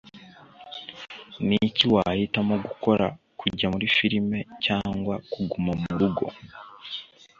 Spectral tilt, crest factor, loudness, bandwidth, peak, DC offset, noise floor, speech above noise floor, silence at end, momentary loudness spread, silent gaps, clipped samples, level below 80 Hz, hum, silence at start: -6.5 dB/octave; 22 dB; -25 LUFS; 7.2 kHz; -4 dBFS; under 0.1%; -49 dBFS; 24 dB; 0.35 s; 18 LU; none; under 0.1%; -52 dBFS; none; 0.05 s